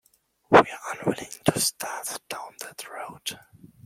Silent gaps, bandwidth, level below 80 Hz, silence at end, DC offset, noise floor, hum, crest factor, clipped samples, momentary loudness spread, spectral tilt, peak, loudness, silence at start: none; 16.5 kHz; -60 dBFS; 0.5 s; under 0.1%; -53 dBFS; none; 26 dB; under 0.1%; 19 LU; -3.5 dB/octave; -2 dBFS; -25 LUFS; 0.5 s